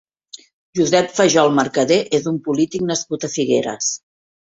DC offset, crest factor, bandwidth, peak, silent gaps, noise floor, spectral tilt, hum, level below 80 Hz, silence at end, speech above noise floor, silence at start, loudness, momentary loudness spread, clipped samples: under 0.1%; 18 dB; 8.2 kHz; -2 dBFS; 0.53-0.73 s; -43 dBFS; -4 dB/octave; none; -60 dBFS; 0.55 s; 26 dB; 0.35 s; -18 LUFS; 8 LU; under 0.1%